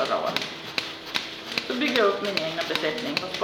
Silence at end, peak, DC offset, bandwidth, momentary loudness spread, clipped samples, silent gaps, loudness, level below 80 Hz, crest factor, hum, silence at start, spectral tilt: 0 s; -4 dBFS; under 0.1%; over 20 kHz; 8 LU; under 0.1%; none; -26 LUFS; -66 dBFS; 24 dB; none; 0 s; -3 dB/octave